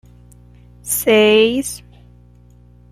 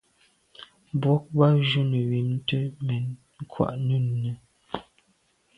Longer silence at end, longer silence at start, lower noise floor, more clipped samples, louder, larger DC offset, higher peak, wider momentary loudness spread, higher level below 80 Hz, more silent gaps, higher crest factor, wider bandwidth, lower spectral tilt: first, 1.15 s vs 0.75 s; first, 0.85 s vs 0.6 s; second, -46 dBFS vs -67 dBFS; neither; first, -14 LUFS vs -25 LUFS; neither; first, -2 dBFS vs -6 dBFS; about the same, 21 LU vs 20 LU; first, -46 dBFS vs -60 dBFS; neither; second, 16 dB vs 22 dB; first, 15.5 kHz vs 5 kHz; second, -3 dB/octave vs -8.5 dB/octave